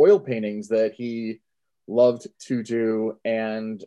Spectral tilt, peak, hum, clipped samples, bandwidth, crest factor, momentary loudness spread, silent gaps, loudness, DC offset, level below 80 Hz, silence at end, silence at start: -6.5 dB/octave; -6 dBFS; none; under 0.1%; 10 kHz; 16 dB; 11 LU; none; -24 LUFS; under 0.1%; -76 dBFS; 0 s; 0 s